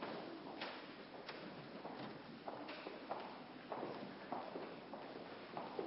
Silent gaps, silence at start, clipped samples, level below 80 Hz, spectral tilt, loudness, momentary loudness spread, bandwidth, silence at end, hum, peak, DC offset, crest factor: none; 0 s; under 0.1%; -82 dBFS; -3 dB/octave; -50 LUFS; 4 LU; 5.6 kHz; 0 s; none; -30 dBFS; under 0.1%; 20 dB